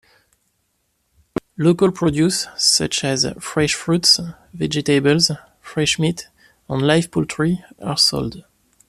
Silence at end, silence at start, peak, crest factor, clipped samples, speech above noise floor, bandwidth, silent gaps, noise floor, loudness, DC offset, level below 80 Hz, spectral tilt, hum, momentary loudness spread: 0.5 s; 1.6 s; -2 dBFS; 18 dB; under 0.1%; 50 dB; 14.5 kHz; none; -68 dBFS; -18 LUFS; under 0.1%; -48 dBFS; -4 dB/octave; none; 14 LU